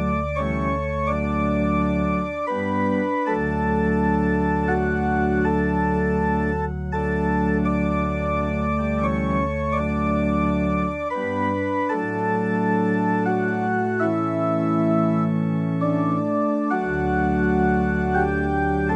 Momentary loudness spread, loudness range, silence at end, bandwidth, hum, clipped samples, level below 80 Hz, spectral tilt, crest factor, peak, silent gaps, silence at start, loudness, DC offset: 3 LU; 1 LU; 0 s; 9.4 kHz; none; under 0.1%; -34 dBFS; -9 dB/octave; 14 dB; -8 dBFS; none; 0 s; -22 LUFS; under 0.1%